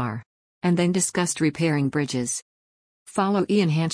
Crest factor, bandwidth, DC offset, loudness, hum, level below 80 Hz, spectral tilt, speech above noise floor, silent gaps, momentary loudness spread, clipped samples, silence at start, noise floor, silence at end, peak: 14 dB; 10.5 kHz; under 0.1%; -23 LUFS; none; -64 dBFS; -5 dB/octave; over 68 dB; 0.26-0.61 s, 2.42-3.06 s; 10 LU; under 0.1%; 0 s; under -90 dBFS; 0 s; -10 dBFS